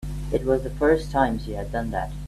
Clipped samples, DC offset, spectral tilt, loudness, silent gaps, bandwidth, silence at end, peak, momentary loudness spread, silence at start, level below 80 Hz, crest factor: under 0.1%; under 0.1%; -7 dB/octave; -24 LUFS; none; 14 kHz; 0 s; -6 dBFS; 8 LU; 0 s; -34 dBFS; 18 dB